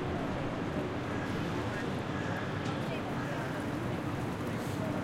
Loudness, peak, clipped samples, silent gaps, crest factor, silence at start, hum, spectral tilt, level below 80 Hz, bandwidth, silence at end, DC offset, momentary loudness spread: -35 LUFS; -22 dBFS; under 0.1%; none; 12 dB; 0 s; none; -6.5 dB/octave; -54 dBFS; 16.5 kHz; 0 s; under 0.1%; 1 LU